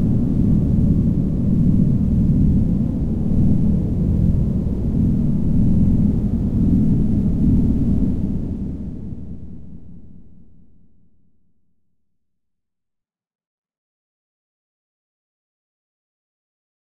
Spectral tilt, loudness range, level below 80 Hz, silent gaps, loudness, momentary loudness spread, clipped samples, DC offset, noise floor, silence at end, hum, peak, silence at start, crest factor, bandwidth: -12 dB/octave; 13 LU; -26 dBFS; 13.47-13.64 s; -19 LUFS; 11 LU; under 0.1%; 2%; -84 dBFS; 3.1 s; none; -6 dBFS; 0 s; 14 dB; 4 kHz